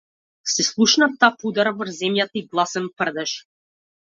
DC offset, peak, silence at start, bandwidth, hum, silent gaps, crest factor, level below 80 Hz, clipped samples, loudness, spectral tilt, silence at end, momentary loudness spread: under 0.1%; -2 dBFS; 0.45 s; 7.8 kHz; none; none; 20 dB; -70 dBFS; under 0.1%; -20 LUFS; -2.5 dB/octave; 0.65 s; 11 LU